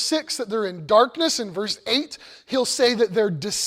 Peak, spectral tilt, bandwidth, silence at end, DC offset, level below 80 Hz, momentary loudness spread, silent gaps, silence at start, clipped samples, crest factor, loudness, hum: -4 dBFS; -3 dB/octave; 16 kHz; 0 s; under 0.1%; -62 dBFS; 8 LU; none; 0 s; under 0.1%; 18 dB; -22 LUFS; none